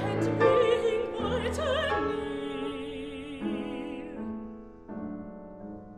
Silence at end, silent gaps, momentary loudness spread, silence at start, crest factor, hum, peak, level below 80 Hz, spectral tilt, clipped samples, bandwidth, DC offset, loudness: 0 s; none; 19 LU; 0 s; 20 dB; none; -10 dBFS; -50 dBFS; -6 dB/octave; under 0.1%; 12.5 kHz; under 0.1%; -30 LUFS